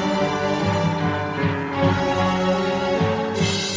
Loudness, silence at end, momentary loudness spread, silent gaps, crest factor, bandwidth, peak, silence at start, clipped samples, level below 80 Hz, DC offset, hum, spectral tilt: -21 LUFS; 0 s; 3 LU; none; 14 dB; 8 kHz; -6 dBFS; 0 s; under 0.1%; -42 dBFS; under 0.1%; none; -5.5 dB/octave